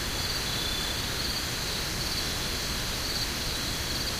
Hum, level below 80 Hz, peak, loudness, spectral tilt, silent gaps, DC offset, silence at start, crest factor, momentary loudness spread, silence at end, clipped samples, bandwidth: none; -40 dBFS; -16 dBFS; -29 LUFS; -2 dB/octave; none; under 0.1%; 0 s; 14 dB; 1 LU; 0 s; under 0.1%; 16 kHz